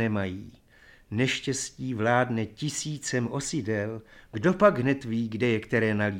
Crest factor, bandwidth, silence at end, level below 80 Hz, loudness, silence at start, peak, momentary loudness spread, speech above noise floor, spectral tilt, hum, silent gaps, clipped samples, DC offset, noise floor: 20 dB; 16.5 kHz; 0 s; -58 dBFS; -27 LUFS; 0 s; -8 dBFS; 12 LU; 29 dB; -5 dB/octave; none; none; under 0.1%; under 0.1%; -56 dBFS